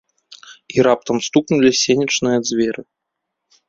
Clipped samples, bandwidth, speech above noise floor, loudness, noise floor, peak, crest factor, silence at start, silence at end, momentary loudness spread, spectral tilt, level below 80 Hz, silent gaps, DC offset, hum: under 0.1%; 7.8 kHz; 62 dB; -17 LUFS; -78 dBFS; -2 dBFS; 16 dB; 0.3 s; 0.85 s; 8 LU; -4 dB/octave; -56 dBFS; none; under 0.1%; none